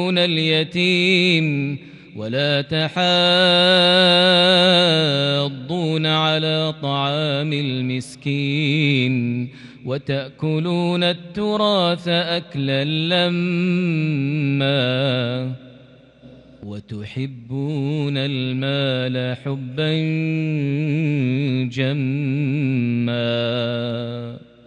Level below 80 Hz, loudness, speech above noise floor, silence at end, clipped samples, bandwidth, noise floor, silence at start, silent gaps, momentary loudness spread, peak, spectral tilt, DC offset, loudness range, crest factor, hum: -62 dBFS; -19 LUFS; 27 dB; 0.3 s; under 0.1%; 11 kHz; -47 dBFS; 0 s; none; 14 LU; -4 dBFS; -6 dB/octave; under 0.1%; 9 LU; 16 dB; none